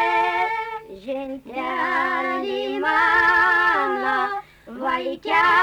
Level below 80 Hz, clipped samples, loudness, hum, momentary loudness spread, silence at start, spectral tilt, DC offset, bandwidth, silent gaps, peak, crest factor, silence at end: -54 dBFS; under 0.1%; -20 LUFS; none; 15 LU; 0 s; -3.5 dB/octave; under 0.1%; 20 kHz; none; -8 dBFS; 14 dB; 0 s